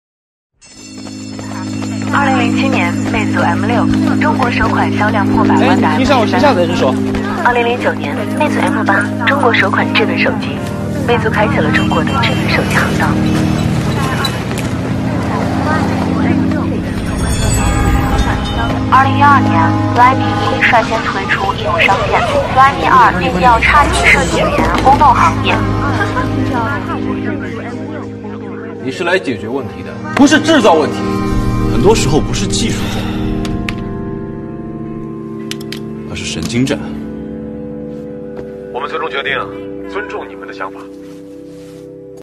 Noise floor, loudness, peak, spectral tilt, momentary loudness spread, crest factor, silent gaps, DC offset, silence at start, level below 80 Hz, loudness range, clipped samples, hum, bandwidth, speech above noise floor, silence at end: -33 dBFS; -13 LUFS; 0 dBFS; -5.5 dB/octave; 16 LU; 14 dB; none; under 0.1%; 0.7 s; -28 dBFS; 11 LU; 0.1%; none; 13.5 kHz; 21 dB; 0 s